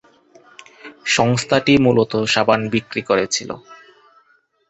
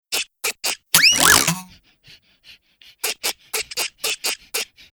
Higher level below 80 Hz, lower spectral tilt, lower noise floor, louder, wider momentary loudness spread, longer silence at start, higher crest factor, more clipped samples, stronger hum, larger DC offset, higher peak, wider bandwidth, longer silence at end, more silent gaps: about the same, -52 dBFS vs -52 dBFS; first, -4.5 dB/octave vs 0 dB/octave; first, -59 dBFS vs -51 dBFS; about the same, -17 LUFS vs -18 LUFS; about the same, 15 LU vs 14 LU; first, 0.85 s vs 0.1 s; about the same, 18 dB vs 22 dB; neither; neither; neither; about the same, -2 dBFS vs 0 dBFS; second, 8.4 kHz vs over 20 kHz; first, 0.95 s vs 0.3 s; neither